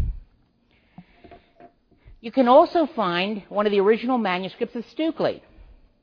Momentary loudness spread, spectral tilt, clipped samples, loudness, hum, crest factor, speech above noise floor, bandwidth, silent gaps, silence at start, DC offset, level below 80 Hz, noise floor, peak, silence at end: 15 LU; -8 dB/octave; under 0.1%; -22 LUFS; none; 20 dB; 41 dB; 5.4 kHz; none; 0 s; under 0.1%; -42 dBFS; -62 dBFS; -4 dBFS; 0.65 s